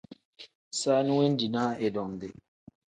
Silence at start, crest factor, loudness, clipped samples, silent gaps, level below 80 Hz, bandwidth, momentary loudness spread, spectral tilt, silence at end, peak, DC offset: 0.4 s; 18 dB; -28 LUFS; under 0.1%; 0.55-0.71 s; -68 dBFS; 9.6 kHz; 16 LU; -5 dB/octave; 0.65 s; -12 dBFS; under 0.1%